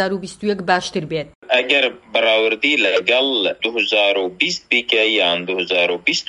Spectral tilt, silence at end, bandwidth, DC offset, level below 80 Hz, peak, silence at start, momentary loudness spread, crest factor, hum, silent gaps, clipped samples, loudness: -3 dB/octave; 0.05 s; 11.5 kHz; under 0.1%; -60 dBFS; 0 dBFS; 0 s; 8 LU; 18 dB; none; 1.35-1.42 s; under 0.1%; -17 LUFS